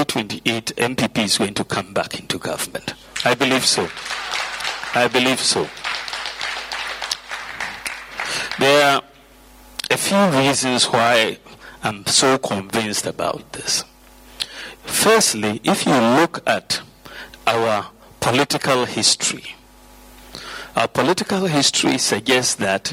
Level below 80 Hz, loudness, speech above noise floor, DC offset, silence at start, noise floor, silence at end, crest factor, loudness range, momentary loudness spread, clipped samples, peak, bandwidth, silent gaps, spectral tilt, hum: -54 dBFS; -19 LUFS; 28 dB; under 0.1%; 0 s; -47 dBFS; 0 s; 18 dB; 4 LU; 13 LU; under 0.1%; -2 dBFS; 16.5 kHz; none; -2.5 dB/octave; none